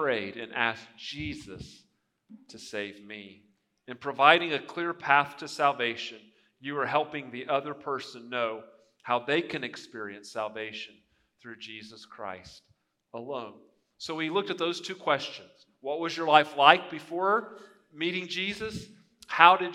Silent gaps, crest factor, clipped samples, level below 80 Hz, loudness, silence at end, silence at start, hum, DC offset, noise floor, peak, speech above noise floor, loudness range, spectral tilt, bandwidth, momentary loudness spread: none; 30 dB; under 0.1%; -68 dBFS; -28 LUFS; 0 s; 0 s; none; under 0.1%; -56 dBFS; 0 dBFS; 27 dB; 15 LU; -4 dB/octave; 12.5 kHz; 23 LU